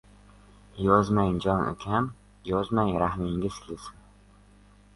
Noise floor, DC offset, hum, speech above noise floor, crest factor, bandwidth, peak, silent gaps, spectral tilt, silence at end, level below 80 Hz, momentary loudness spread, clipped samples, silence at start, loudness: -55 dBFS; under 0.1%; 50 Hz at -45 dBFS; 29 dB; 22 dB; 11.5 kHz; -6 dBFS; none; -7.5 dB/octave; 1.05 s; -48 dBFS; 18 LU; under 0.1%; 0.75 s; -27 LUFS